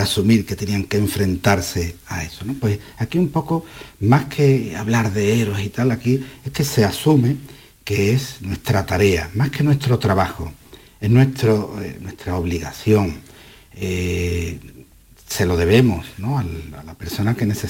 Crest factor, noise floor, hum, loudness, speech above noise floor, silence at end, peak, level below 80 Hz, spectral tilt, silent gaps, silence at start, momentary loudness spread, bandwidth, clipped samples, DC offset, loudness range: 16 dB; -46 dBFS; none; -19 LUFS; 28 dB; 0 s; -4 dBFS; -40 dBFS; -6 dB/octave; none; 0 s; 13 LU; 17 kHz; under 0.1%; under 0.1%; 3 LU